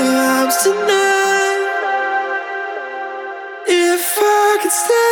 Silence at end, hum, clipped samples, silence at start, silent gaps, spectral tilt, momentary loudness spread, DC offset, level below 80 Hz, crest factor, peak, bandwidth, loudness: 0 s; none; under 0.1%; 0 s; none; -1 dB/octave; 12 LU; under 0.1%; -74 dBFS; 14 dB; -2 dBFS; over 20 kHz; -15 LUFS